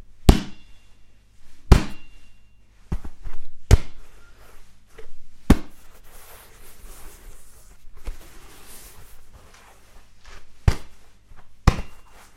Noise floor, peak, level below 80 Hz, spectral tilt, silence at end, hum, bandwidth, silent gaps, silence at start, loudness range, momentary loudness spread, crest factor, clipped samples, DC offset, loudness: -48 dBFS; 0 dBFS; -28 dBFS; -6 dB/octave; 0.35 s; none; 15.5 kHz; none; 0.1 s; 20 LU; 27 LU; 24 dB; under 0.1%; under 0.1%; -23 LUFS